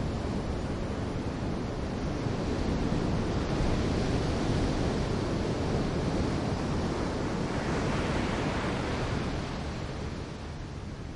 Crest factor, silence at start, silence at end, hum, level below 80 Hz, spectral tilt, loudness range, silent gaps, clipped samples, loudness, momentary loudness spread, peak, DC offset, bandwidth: 14 dB; 0 s; 0 s; none; -38 dBFS; -6.5 dB/octave; 2 LU; none; under 0.1%; -31 LUFS; 7 LU; -16 dBFS; under 0.1%; 11.5 kHz